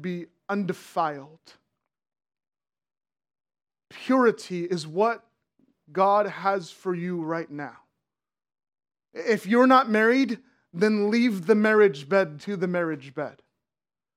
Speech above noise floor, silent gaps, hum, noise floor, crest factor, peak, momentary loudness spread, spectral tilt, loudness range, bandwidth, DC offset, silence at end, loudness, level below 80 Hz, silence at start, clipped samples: over 66 dB; none; none; under -90 dBFS; 22 dB; -4 dBFS; 17 LU; -6 dB/octave; 12 LU; 15 kHz; under 0.1%; 0.85 s; -24 LUFS; -84 dBFS; 0 s; under 0.1%